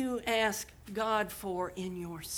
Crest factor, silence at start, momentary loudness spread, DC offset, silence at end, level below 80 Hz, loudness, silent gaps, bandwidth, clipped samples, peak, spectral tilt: 18 dB; 0 s; 10 LU; under 0.1%; 0 s; -58 dBFS; -34 LUFS; none; over 20 kHz; under 0.1%; -16 dBFS; -3.5 dB/octave